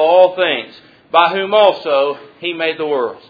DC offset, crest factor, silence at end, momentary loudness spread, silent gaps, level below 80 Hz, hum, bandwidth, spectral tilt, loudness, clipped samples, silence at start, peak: under 0.1%; 14 dB; 0.1 s; 11 LU; none; -66 dBFS; none; 5 kHz; -6 dB/octave; -15 LUFS; under 0.1%; 0 s; 0 dBFS